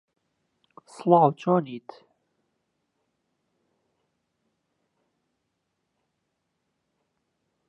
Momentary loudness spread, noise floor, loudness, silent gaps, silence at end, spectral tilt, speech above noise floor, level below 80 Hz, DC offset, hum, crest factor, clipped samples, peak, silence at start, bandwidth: 19 LU; -79 dBFS; -22 LUFS; none; 5.9 s; -8.5 dB/octave; 56 dB; -84 dBFS; under 0.1%; none; 26 dB; under 0.1%; -4 dBFS; 1 s; 10 kHz